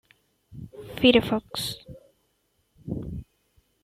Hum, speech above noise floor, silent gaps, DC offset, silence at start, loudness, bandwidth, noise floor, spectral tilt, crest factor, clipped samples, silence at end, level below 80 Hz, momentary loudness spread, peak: none; 48 dB; none; under 0.1%; 0.5 s; -24 LUFS; 15.5 kHz; -71 dBFS; -5 dB/octave; 24 dB; under 0.1%; 0.6 s; -50 dBFS; 24 LU; -4 dBFS